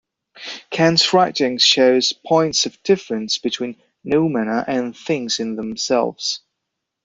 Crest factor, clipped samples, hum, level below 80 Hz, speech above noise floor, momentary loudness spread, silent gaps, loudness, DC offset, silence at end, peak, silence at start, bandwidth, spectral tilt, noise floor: 18 dB; under 0.1%; none; -60 dBFS; 61 dB; 13 LU; none; -18 LUFS; under 0.1%; 0.65 s; -2 dBFS; 0.35 s; 7.8 kHz; -3.5 dB/octave; -79 dBFS